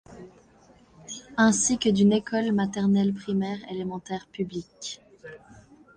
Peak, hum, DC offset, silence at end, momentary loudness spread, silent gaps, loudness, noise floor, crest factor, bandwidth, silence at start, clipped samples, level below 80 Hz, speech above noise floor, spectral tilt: -8 dBFS; none; under 0.1%; 0.6 s; 19 LU; none; -25 LUFS; -56 dBFS; 18 dB; 10 kHz; 0.1 s; under 0.1%; -60 dBFS; 32 dB; -4.5 dB/octave